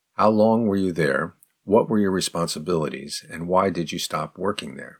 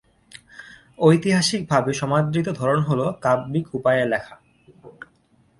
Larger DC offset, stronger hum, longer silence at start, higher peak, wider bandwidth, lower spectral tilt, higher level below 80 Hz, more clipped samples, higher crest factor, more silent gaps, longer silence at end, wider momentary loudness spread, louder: neither; neither; second, 0.2 s vs 0.55 s; about the same, -4 dBFS vs -2 dBFS; first, 18 kHz vs 11.5 kHz; about the same, -5 dB/octave vs -5.5 dB/octave; about the same, -58 dBFS vs -58 dBFS; neither; about the same, 18 dB vs 20 dB; neither; second, 0.1 s vs 0.7 s; first, 12 LU vs 9 LU; about the same, -23 LUFS vs -21 LUFS